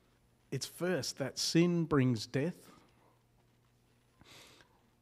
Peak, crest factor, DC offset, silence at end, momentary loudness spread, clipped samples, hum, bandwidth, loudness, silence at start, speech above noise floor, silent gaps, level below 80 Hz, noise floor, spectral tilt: -16 dBFS; 20 dB; under 0.1%; 0.6 s; 11 LU; under 0.1%; none; 15.5 kHz; -34 LUFS; 0.5 s; 37 dB; none; -68 dBFS; -70 dBFS; -5 dB/octave